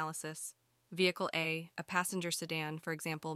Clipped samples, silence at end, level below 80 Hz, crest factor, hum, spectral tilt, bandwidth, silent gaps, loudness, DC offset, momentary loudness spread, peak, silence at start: under 0.1%; 0 s; -82 dBFS; 20 dB; none; -3.5 dB/octave; 16 kHz; none; -37 LUFS; under 0.1%; 10 LU; -18 dBFS; 0 s